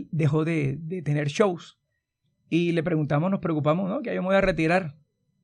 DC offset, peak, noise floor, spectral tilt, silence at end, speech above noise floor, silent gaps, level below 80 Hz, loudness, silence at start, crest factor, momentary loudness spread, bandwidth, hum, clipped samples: under 0.1%; -8 dBFS; -76 dBFS; -7.5 dB/octave; 0.5 s; 52 dB; none; -50 dBFS; -25 LUFS; 0 s; 18 dB; 6 LU; 10 kHz; none; under 0.1%